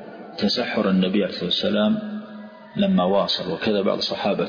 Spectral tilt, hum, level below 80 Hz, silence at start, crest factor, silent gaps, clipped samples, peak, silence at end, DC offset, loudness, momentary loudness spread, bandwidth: -6.5 dB/octave; none; -60 dBFS; 0 s; 14 dB; none; under 0.1%; -8 dBFS; 0 s; under 0.1%; -22 LUFS; 14 LU; 5.2 kHz